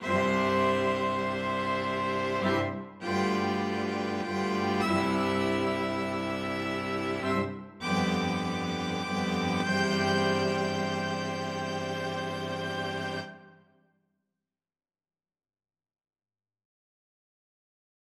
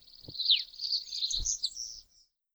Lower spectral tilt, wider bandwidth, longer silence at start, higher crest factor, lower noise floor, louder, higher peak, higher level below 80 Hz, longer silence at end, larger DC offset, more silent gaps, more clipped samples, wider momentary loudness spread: first, -5.5 dB/octave vs 1.5 dB/octave; second, 14 kHz vs over 20 kHz; second, 0 s vs 0.15 s; second, 16 dB vs 22 dB; first, under -90 dBFS vs -67 dBFS; about the same, -30 LUFS vs -30 LUFS; about the same, -14 dBFS vs -14 dBFS; second, -64 dBFS vs -50 dBFS; first, 4.6 s vs 0.5 s; neither; neither; neither; second, 7 LU vs 16 LU